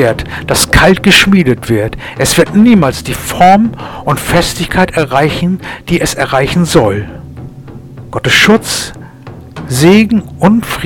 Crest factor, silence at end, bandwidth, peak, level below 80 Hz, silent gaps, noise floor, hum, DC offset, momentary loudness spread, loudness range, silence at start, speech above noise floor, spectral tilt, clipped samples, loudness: 10 dB; 0 s; 19 kHz; 0 dBFS; -28 dBFS; none; -30 dBFS; none; under 0.1%; 16 LU; 4 LU; 0 s; 21 dB; -4.5 dB/octave; 1%; -9 LUFS